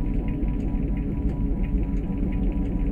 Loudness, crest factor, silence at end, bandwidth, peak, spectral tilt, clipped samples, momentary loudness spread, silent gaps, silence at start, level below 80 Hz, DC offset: -27 LUFS; 12 dB; 0 s; 3.2 kHz; -12 dBFS; -10.5 dB/octave; under 0.1%; 1 LU; none; 0 s; -26 dBFS; under 0.1%